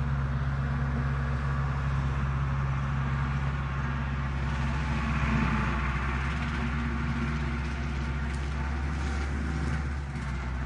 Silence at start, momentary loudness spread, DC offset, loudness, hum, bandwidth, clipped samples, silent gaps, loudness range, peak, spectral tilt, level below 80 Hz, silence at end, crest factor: 0 s; 4 LU; under 0.1%; -31 LUFS; none; 9.6 kHz; under 0.1%; none; 2 LU; -14 dBFS; -7 dB/octave; -34 dBFS; 0 s; 14 dB